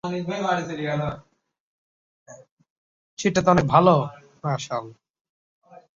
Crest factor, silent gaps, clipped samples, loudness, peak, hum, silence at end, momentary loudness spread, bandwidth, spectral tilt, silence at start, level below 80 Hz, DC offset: 22 dB; 1.60-2.26 s, 2.51-2.57 s, 2.70-3.17 s, 5.10-5.14 s, 5.21-5.62 s; under 0.1%; -23 LUFS; -2 dBFS; none; 0.15 s; 16 LU; 7.6 kHz; -6 dB/octave; 0.05 s; -54 dBFS; under 0.1%